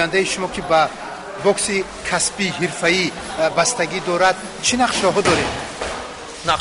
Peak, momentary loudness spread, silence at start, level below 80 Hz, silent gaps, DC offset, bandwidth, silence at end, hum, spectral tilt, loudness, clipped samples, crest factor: -4 dBFS; 10 LU; 0 s; -46 dBFS; none; under 0.1%; 11 kHz; 0 s; none; -2.5 dB/octave; -19 LUFS; under 0.1%; 14 dB